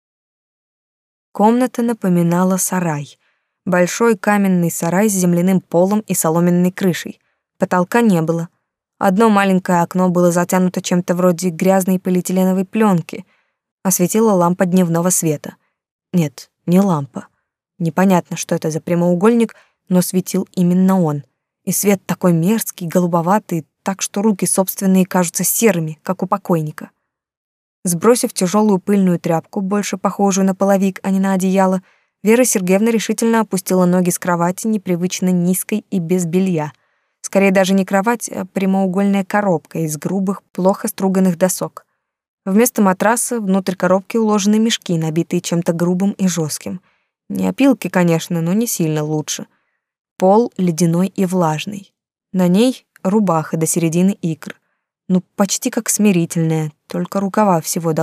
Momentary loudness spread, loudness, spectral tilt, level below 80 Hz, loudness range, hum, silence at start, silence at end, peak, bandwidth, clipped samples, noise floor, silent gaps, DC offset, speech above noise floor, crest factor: 9 LU; -16 LUFS; -5.5 dB/octave; -70 dBFS; 3 LU; none; 1.35 s; 0 s; -2 dBFS; 16 kHz; under 0.1%; -41 dBFS; 13.71-13.78 s, 15.91-15.99 s, 27.37-27.83 s, 42.28-42.38 s, 49.99-50.05 s, 50.11-50.16 s; under 0.1%; 26 dB; 14 dB